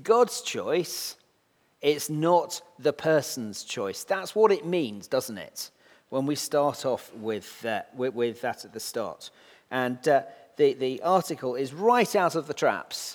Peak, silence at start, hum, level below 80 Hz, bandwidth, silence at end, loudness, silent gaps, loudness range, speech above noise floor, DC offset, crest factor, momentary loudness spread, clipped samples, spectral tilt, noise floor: -6 dBFS; 0 s; none; -78 dBFS; 19.5 kHz; 0 s; -27 LUFS; none; 5 LU; 41 dB; under 0.1%; 20 dB; 11 LU; under 0.1%; -4 dB/octave; -68 dBFS